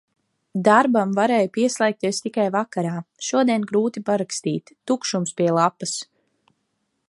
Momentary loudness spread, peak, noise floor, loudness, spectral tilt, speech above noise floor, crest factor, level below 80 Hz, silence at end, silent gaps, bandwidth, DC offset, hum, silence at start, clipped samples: 11 LU; -2 dBFS; -73 dBFS; -21 LUFS; -4.5 dB/octave; 52 dB; 20 dB; -72 dBFS; 1.05 s; none; 11.5 kHz; under 0.1%; none; 0.55 s; under 0.1%